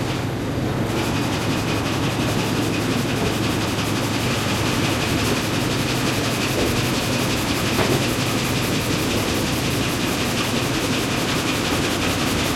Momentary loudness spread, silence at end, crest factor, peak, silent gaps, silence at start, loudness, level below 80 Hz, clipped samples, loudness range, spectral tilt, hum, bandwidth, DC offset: 2 LU; 0 s; 16 dB; -4 dBFS; none; 0 s; -21 LUFS; -38 dBFS; under 0.1%; 1 LU; -4.5 dB/octave; none; 16.5 kHz; under 0.1%